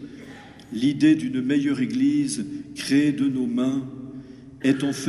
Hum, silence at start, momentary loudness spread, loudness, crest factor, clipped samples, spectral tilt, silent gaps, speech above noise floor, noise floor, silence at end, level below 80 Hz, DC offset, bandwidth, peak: none; 0 s; 21 LU; -23 LUFS; 16 dB; under 0.1%; -5.5 dB/octave; none; 21 dB; -43 dBFS; 0 s; -60 dBFS; under 0.1%; 12 kHz; -8 dBFS